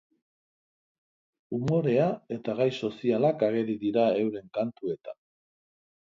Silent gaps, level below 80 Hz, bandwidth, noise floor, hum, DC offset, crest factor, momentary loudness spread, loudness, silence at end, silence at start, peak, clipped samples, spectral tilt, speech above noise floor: none; -68 dBFS; 7.6 kHz; under -90 dBFS; none; under 0.1%; 18 dB; 10 LU; -28 LUFS; 0.9 s; 1.5 s; -12 dBFS; under 0.1%; -8 dB/octave; over 63 dB